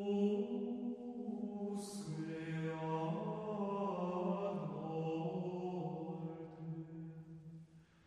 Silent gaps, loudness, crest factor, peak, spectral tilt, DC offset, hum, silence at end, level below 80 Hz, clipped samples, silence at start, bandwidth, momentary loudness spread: none; -42 LUFS; 16 dB; -26 dBFS; -7.5 dB/octave; under 0.1%; none; 0.2 s; -78 dBFS; under 0.1%; 0 s; 11.5 kHz; 11 LU